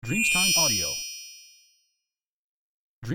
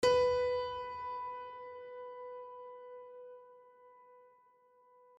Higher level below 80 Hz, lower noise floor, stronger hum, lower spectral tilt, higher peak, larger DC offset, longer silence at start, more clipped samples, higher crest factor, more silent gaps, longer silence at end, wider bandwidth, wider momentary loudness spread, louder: first, -54 dBFS vs -66 dBFS; first, -86 dBFS vs -67 dBFS; neither; second, -1.5 dB/octave vs -3.5 dB/octave; first, -10 dBFS vs -18 dBFS; neither; about the same, 0.05 s vs 0 s; neither; about the same, 18 dB vs 20 dB; first, 2.27-3.02 s vs none; second, 0 s vs 0.95 s; first, 17 kHz vs 10.5 kHz; about the same, 22 LU vs 24 LU; first, -21 LUFS vs -37 LUFS